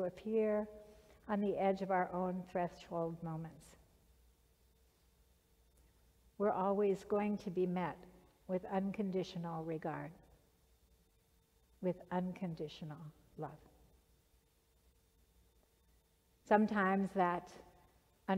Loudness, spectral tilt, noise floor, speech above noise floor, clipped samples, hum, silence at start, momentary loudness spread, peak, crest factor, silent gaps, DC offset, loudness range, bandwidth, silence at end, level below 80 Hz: -38 LUFS; -8 dB/octave; -73 dBFS; 36 dB; under 0.1%; none; 0 s; 15 LU; -16 dBFS; 24 dB; none; under 0.1%; 12 LU; 15 kHz; 0 s; -70 dBFS